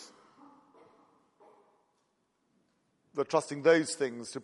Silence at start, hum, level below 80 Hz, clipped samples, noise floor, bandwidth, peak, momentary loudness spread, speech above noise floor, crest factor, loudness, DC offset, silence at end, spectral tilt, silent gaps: 0 s; none; -86 dBFS; under 0.1%; -76 dBFS; 11.5 kHz; -10 dBFS; 11 LU; 47 dB; 24 dB; -30 LUFS; under 0.1%; 0 s; -4 dB/octave; none